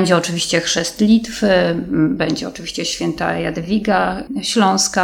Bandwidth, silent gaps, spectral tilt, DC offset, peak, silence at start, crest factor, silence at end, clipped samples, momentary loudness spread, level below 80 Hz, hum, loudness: 16.5 kHz; none; -4 dB/octave; under 0.1%; 0 dBFS; 0 s; 16 dB; 0 s; under 0.1%; 7 LU; -44 dBFS; none; -17 LUFS